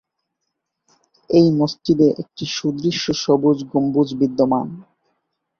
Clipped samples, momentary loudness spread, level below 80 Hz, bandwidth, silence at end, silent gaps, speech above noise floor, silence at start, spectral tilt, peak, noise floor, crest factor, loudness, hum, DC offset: under 0.1%; 7 LU; -58 dBFS; 7 kHz; 0.75 s; none; 60 dB; 1.3 s; -6 dB/octave; -2 dBFS; -77 dBFS; 18 dB; -18 LUFS; none; under 0.1%